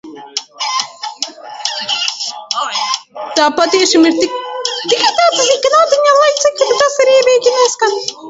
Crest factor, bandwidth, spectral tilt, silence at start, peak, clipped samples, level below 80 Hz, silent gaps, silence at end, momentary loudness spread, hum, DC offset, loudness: 14 dB; 8 kHz; -0.5 dB/octave; 0.05 s; 0 dBFS; under 0.1%; -60 dBFS; none; 0 s; 12 LU; none; under 0.1%; -12 LUFS